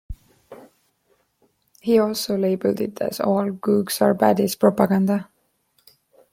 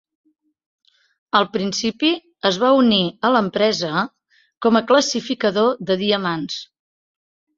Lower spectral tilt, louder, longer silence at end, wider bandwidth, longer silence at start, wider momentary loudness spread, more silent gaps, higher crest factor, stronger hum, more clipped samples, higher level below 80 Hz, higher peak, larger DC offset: first, -6 dB/octave vs -4 dB/octave; about the same, -21 LUFS vs -19 LUFS; first, 1.1 s vs 0.95 s; first, 16.5 kHz vs 7.8 kHz; second, 0.1 s vs 1.35 s; about the same, 8 LU vs 8 LU; second, none vs 4.57-4.61 s; about the same, 20 dB vs 18 dB; neither; neither; first, -52 dBFS vs -62 dBFS; about the same, -2 dBFS vs -2 dBFS; neither